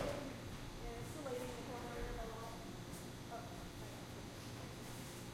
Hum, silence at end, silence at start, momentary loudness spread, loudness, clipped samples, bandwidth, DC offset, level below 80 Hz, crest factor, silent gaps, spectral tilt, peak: none; 0 s; 0 s; 5 LU; -49 LUFS; under 0.1%; 16.5 kHz; under 0.1%; -56 dBFS; 20 dB; none; -5 dB/octave; -28 dBFS